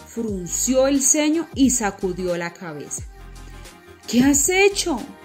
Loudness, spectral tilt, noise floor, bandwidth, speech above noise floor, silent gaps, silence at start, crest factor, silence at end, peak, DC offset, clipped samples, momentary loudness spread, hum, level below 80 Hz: -19 LUFS; -3 dB/octave; -42 dBFS; 16 kHz; 22 dB; none; 0 s; 16 dB; 0 s; -4 dBFS; under 0.1%; under 0.1%; 15 LU; none; -42 dBFS